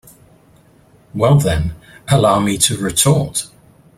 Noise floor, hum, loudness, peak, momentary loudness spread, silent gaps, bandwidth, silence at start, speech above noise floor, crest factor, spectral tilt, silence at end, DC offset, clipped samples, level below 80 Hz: -49 dBFS; none; -15 LUFS; 0 dBFS; 14 LU; none; 16 kHz; 1.15 s; 35 dB; 16 dB; -4.5 dB/octave; 0.5 s; under 0.1%; under 0.1%; -38 dBFS